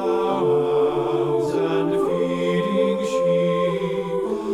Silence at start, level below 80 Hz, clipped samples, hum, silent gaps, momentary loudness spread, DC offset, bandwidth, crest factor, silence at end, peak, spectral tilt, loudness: 0 s; -54 dBFS; under 0.1%; none; none; 5 LU; under 0.1%; 13 kHz; 12 dB; 0 s; -10 dBFS; -7 dB/octave; -21 LUFS